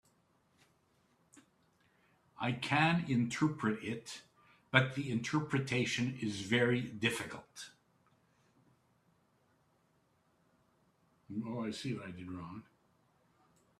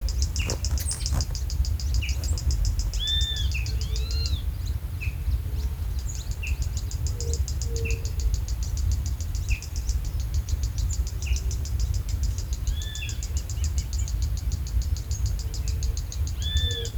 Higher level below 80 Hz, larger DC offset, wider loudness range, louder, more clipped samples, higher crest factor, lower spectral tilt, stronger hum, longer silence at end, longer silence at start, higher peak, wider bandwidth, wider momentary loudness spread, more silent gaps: second, -74 dBFS vs -28 dBFS; neither; first, 12 LU vs 3 LU; second, -35 LUFS vs -29 LUFS; neither; first, 30 dB vs 18 dB; first, -5.5 dB/octave vs -3.5 dB/octave; neither; first, 1.2 s vs 0 s; first, 1.35 s vs 0 s; about the same, -8 dBFS vs -8 dBFS; second, 13.5 kHz vs over 20 kHz; first, 17 LU vs 4 LU; neither